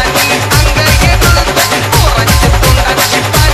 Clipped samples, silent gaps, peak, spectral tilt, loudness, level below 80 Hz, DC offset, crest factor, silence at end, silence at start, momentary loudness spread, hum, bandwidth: 0.8%; none; 0 dBFS; -3.5 dB/octave; -8 LUFS; -14 dBFS; under 0.1%; 8 dB; 0 s; 0 s; 2 LU; none; 16 kHz